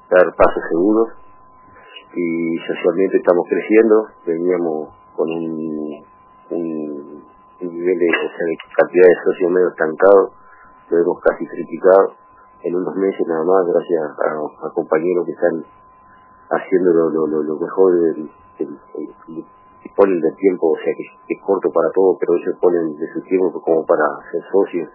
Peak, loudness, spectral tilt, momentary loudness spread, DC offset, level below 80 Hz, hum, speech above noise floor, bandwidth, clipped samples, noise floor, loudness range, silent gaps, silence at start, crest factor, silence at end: 0 dBFS; -17 LUFS; -10.5 dB/octave; 16 LU; under 0.1%; -52 dBFS; none; 30 dB; 3.1 kHz; under 0.1%; -47 dBFS; 6 LU; none; 0.1 s; 18 dB; 0.05 s